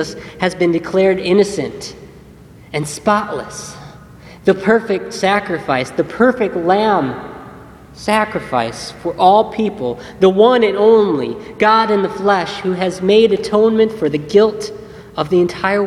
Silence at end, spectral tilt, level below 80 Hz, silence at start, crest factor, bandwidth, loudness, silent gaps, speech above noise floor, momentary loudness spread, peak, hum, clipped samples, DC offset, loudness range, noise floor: 0 s; -5.5 dB/octave; -48 dBFS; 0 s; 16 dB; 12.5 kHz; -15 LUFS; none; 25 dB; 14 LU; 0 dBFS; none; under 0.1%; under 0.1%; 5 LU; -40 dBFS